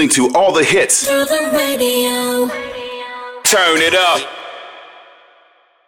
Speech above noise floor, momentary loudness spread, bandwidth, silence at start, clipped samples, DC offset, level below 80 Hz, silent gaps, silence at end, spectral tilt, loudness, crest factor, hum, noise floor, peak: 38 dB; 16 LU; 16.5 kHz; 0 s; under 0.1%; under 0.1%; -56 dBFS; none; 0.95 s; -1.5 dB/octave; -13 LUFS; 14 dB; none; -52 dBFS; -2 dBFS